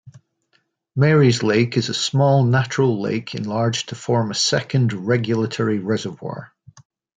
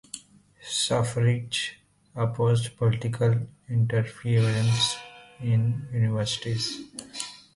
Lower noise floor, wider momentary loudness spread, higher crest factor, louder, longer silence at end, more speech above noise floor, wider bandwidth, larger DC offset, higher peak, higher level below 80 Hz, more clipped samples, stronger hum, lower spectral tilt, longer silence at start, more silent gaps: first, -66 dBFS vs -52 dBFS; second, 10 LU vs 13 LU; about the same, 16 dB vs 16 dB; first, -19 LUFS vs -26 LUFS; first, 0.7 s vs 0.2 s; first, 47 dB vs 28 dB; second, 9.4 kHz vs 11.5 kHz; neither; first, -4 dBFS vs -12 dBFS; about the same, -58 dBFS vs -56 dBFS; neither; neither; about the same, -5.5 dB/octave vs -5 dB/octave; about the same, 0.05 s vs 0.15 s; neither